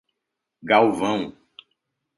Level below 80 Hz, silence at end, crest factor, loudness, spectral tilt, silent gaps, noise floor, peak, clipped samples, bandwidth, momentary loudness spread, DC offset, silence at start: -64 dBFS; 0.85 s; 22 dB; -20 LUFS; -5.5 dB/octave; none; -82 dBFS; -4 dBFS; under 0.1%; 11.5 kHz; 18 LU; under 0.1%; 0.65 s